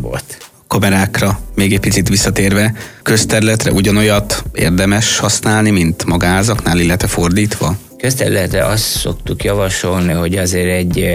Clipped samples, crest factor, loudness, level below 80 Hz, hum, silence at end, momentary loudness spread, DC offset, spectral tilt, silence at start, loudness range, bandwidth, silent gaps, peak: under 0.1%; 14 dB; -13 LUFS; -28 dBFS; none; 0 s; 6 LU; under 0.1%; -4.5 dB/octave; 0 s; 3 LU; 16.5 kHz; none; 0 dBFS